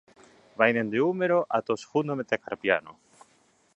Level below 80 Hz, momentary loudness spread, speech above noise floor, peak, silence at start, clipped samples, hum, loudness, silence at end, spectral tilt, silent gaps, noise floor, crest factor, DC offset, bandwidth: -72 dBFS; 6 LU; 38 dB; -4 dBFS; 0.6 s; under 0.1%; none; -26 LUFS; 0.85 s; -6 dB/octave; none; -65 dBFS; 24 dB; under 0.1%; 10 kHz